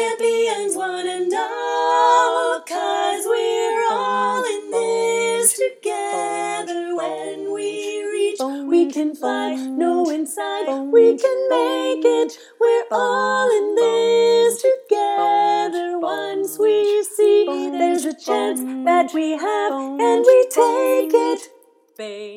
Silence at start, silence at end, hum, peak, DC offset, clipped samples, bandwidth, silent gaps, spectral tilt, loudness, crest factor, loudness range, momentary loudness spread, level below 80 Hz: 0 s; 0 s; none; -2 dBFS; under 0.1%; under 0.1%; 19.5 kHz; none; -2 dB/octave; -19 LUFS; 18 dB; 4 LU; 9 LU; -88 dBFS